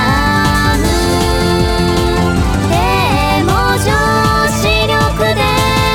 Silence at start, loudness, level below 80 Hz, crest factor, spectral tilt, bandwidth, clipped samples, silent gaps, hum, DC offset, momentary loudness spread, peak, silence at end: 0 s; -12 LUFS; -20 dBFS; 12 dB; -5 dB/octave; 19 kHz; under 0.1%; none; none; under 0.1%; 2 LU; 0 dBFS; 0 s